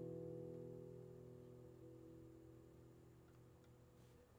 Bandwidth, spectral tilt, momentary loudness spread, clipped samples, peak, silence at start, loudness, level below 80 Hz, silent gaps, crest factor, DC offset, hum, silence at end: over 20 kHz; -8.5 dB/octave; 14 LU; under 0.1%; -42 dBFS; 0 s; -59 LUFS; -78 dBFS; none; 16 dB; under 0.1%; none; 0 s